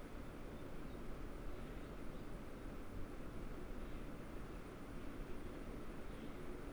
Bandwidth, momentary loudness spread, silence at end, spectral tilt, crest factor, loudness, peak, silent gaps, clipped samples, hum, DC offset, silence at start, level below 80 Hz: over 20 kHz; 1 LU; 0 s; -6.5 dB/octave; 12 dB; -52 LUFS; -34 dBFS; none; under 0.1%; none; under 0.1%; 0 s; -52 dBFS